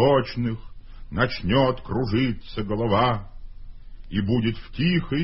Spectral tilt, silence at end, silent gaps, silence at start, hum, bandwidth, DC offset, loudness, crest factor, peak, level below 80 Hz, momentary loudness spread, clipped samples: -11 dB/octave; 0 s; none; 0 s; none; 5.8 kHz; under 0.1%; -24 LUFS; 18 dB; -6 dBFS; -40 dBFS; 9 LU; under 0.1%